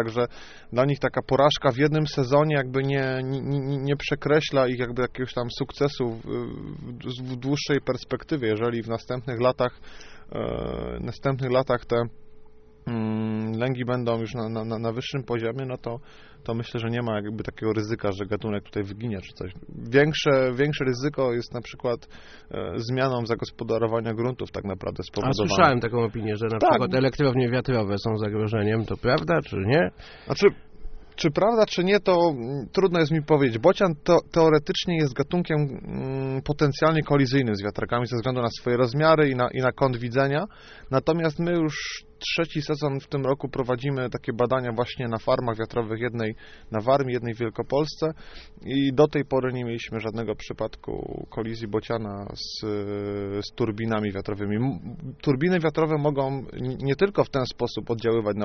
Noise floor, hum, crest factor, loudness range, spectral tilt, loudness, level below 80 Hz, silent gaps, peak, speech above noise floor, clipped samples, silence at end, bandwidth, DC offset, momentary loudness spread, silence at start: -46 dBFS; none; 22 dB; 7 LU; -5.5 dB/octave; -25 LUFS; -48 dBFS; none; -4 dBFS; 22 dB; under 0.1%; 0 s; 6.6 kHz; under 0.1%; 11 LU; 0 s